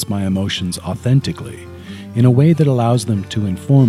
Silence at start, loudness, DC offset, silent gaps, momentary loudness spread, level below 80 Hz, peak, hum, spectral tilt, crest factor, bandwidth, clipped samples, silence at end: 0 s; -16 LUFS; under 0.1%; none; 18 LU; -48 dBFS; 0 dBFS; none; -7 dB/octave; 14 dB; 12.5 kHz; under 0.1%; 0 s